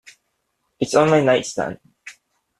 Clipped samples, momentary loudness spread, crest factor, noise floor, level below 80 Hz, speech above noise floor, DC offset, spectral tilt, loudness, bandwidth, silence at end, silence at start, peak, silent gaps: under 0.1%; 14 LU; 20 dB; -72 dBFS; -58 dBFS; 55 dB; under 0.1%; -5 dB/octave; -19 LUFS; 12.5 kHz; 0.5 s; 0.8 s; -2 dBFS; none